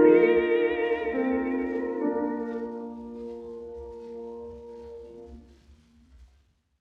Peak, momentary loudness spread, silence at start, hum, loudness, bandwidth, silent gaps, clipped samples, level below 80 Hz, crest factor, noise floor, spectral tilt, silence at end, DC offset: -8 dBFS; 21 LU; 0 s; none; -27 LUFS; 4.6 kHz; none; under 0.1%; -56 dBFS; 20 dB; -65 dBFS; -7.5 dB/octave; 0.55 s; under 0.1%